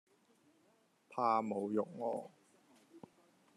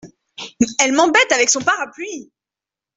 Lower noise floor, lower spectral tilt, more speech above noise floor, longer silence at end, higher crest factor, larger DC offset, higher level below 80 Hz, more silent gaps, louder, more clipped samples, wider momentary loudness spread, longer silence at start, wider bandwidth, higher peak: second, -73 dBFS vs -88 dBFS; first, -7 dB/octave vs -1.5 dB/octave; second, 36 dB vs 72 dB; second, 0.55 s vs 0.75 s; about the same, 22 dB vs 18 dB; neither; second, under -90 dBFS vs -62 dBFS; neither; second, -38 LUFS vs -15 LUFS; neither; second, 18 LU vs 21 LU; first, 1.1 s vs 0.05 s; first, 13 kHz vs 8.4 kHz; second, -18 dBFS vs -2 dBFS